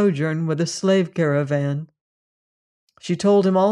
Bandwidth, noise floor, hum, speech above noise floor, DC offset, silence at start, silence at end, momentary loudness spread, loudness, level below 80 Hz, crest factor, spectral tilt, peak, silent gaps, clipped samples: 11 kHz; under -90 dBFS; none; over 71 dB; under 0.1%; 0 s; 0 s; 10 LU; -20 LUFS; -68 dBFS; 14 dB; -6.5 dB/octave; -6 dBFS; 2.01-2.88 s; under 0.1%